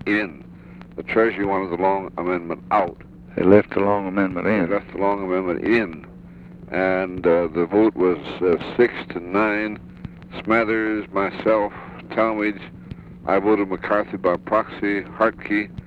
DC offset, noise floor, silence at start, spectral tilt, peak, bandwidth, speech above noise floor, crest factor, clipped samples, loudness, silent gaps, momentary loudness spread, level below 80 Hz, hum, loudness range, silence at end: under 0.1%; -41 dBFS; 0 s; -8.5 dB/octave; 0 dBFS; 5.4 kHz; 20 dB; 22 dB; under 0.1%; -21 LUFS; none; 17 LU; -50 dBFS; none; 2 LU; 0 s